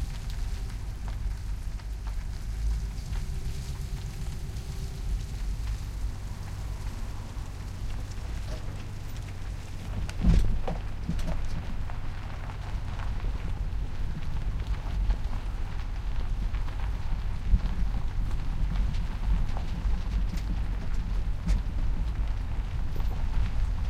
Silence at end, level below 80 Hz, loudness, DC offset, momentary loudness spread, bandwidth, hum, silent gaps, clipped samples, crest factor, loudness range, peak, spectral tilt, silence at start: 0 s; -30 dBFS; -35 LUFS; under 0.1%; 7 LU; 12 kHz; none; none; under 0.1%; 18 dB; 5 LU; -10 dBFS; -6.5 dB/octave; 0 s